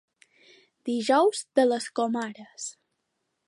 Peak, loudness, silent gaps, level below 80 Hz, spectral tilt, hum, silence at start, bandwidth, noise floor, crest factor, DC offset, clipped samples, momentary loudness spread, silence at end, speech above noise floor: -8 dBFS; -25 LUFS; none; -82 dBFS; -3 dB/octave; none; 0.85 s; 11.5 kHz; -79 dBFS; 20 dB; under 0.1%; under 0.1%; 16 LU; 0.75 s; 53 dB